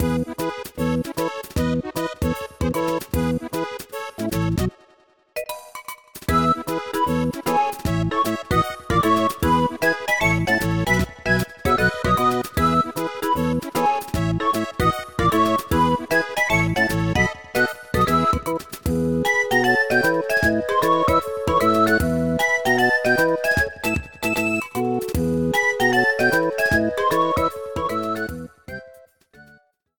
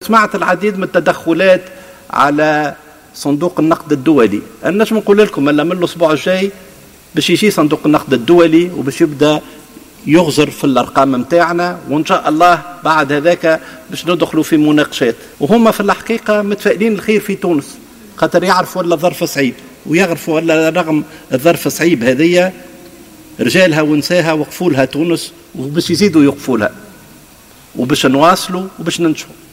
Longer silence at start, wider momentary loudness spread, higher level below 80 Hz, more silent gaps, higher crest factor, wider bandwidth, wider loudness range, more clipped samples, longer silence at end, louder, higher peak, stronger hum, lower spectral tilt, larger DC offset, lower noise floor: about the same, 0 s vs 0 s; about the same, 9 LU vs 8 LU; first, -38 dBFS vs -50 dBFS; neither; about the same, 16 dB vs 12 dB; first, 19.5 kHz vs 16.5 kHz; first, 6 LU vs 2 LU; neither; first, 0.55 s vs 0.2 s; second, -21 LUFS vs -12 LUFS; second, -6 dBFS vs 0 dBFS; neither; about the same, -5.5 dB/octave vs -5 dB/octave; first, 0.3% vs under 0.1%; first, -57 dBFS vs -41 dBFS